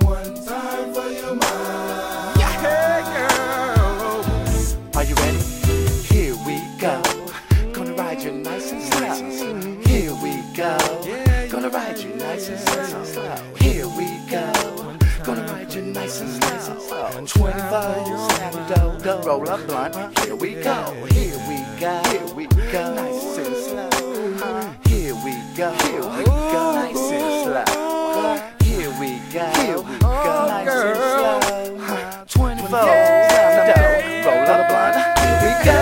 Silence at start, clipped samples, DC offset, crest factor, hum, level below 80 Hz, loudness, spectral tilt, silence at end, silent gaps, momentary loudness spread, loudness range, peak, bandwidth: 0 s; under 0.1%; under 0.1%; 18 dB; none; -28 dBFS; -20 LUFS; -5 dB/octave; 0 s; none; 11 LU; 7 LU; 0 dBFS; 16.5 kHz